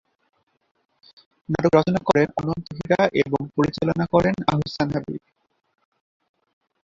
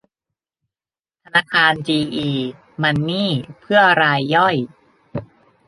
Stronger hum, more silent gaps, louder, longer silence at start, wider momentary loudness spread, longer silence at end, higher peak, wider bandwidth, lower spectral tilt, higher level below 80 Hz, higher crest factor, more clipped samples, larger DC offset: neither; neither; second, -22 LUFS vs -17 LUFS; first, 1.5 s vs 1.35 s; second, 10 LU vs 19 LU; first, 1.7 s vs 0.45 s; about the same, -2 dBFS vs -2 dBFS; second, 7.8 kHz vs 11.5 kHz; about the same, -7 dB/octave vs -6 dB/octave; first, -50 dBFS vs -56 dBFS; about the same, 22 dB vs 18 dB; neither; neither